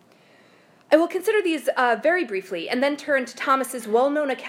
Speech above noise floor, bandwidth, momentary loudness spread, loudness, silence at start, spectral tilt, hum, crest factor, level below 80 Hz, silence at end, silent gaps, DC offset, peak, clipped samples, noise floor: 32 dB; 16 kHz; 4 LU; -22 LUFS; 0.9 s; -3 dB/octave; none; 20 dB; -80 dBFS; 0 s; none; under 0.1%; -2 dBFS; under 0.1%; -55 dBFS